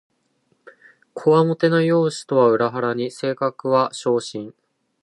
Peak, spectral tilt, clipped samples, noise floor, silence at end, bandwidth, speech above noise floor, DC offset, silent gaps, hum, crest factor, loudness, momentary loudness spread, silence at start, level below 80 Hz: -4 dBFS; -6 dB/octave; under 0.1%; -66 dBFS; 0.5 s; 11.5 kHz; 47 dB; under 0.1%; none; none; 16 dB; -19 LUFS; 11 LU; 1.15 s; -72 dBFS